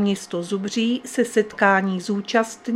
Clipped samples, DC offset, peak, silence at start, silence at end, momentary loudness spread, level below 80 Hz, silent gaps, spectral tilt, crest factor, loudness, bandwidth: under 0.1%; under 0.1%; -2 dBFS; 0 s; 0 s; 8 LU; -66 dBFS; none; -5 dB/octave; 20 dB; -22 LUFS; 14.5 kHz